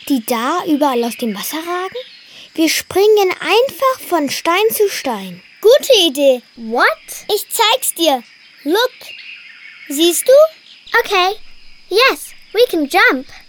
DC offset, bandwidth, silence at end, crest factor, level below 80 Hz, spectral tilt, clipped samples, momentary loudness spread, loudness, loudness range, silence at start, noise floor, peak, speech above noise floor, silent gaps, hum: under 0.1%; 19 kHz; 0.1 s; 14 dB; -52 dBFS; -2 dB/octave; under 0.1%; 15 LU; -14 LUFS; 3 LU; 0.05 s; -37 dBFS; -2 dBFS; 23 dB; none; none